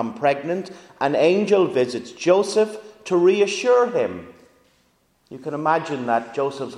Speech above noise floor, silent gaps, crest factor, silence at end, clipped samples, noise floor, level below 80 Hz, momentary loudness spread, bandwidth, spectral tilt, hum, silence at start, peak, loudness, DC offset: 43 dB; none; 18 dB; 0 s; under 0.1%; -63 dBFS; -68 dBFS; 11 LU; 11 kHz; -5 dB/octave; none; 0 s; -4 dBFS; -20 LUFS; under 0.1%